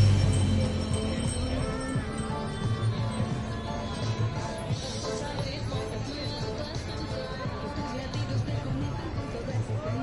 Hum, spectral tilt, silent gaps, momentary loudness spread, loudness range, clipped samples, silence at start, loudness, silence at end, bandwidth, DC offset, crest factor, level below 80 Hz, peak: none; -6 dB/octave; none; 6 LU; 4 LU; under 0.1%; 0 s; -31 LUFS; 0 s; 11.5 kHz; under 0.1%; 18 dB; -40 dBFS; -12 dBFS